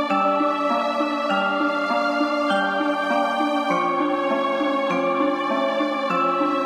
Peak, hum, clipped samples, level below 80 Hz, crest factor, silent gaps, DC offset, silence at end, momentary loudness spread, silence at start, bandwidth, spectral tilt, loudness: -8 dBFS; none; under 0.1%; -74 dBFS; 12 dB; none; under 0.1%; 0 s; 2 LU; 0 s; 11.5 kHz; -5 dB/octave; -21 LUFS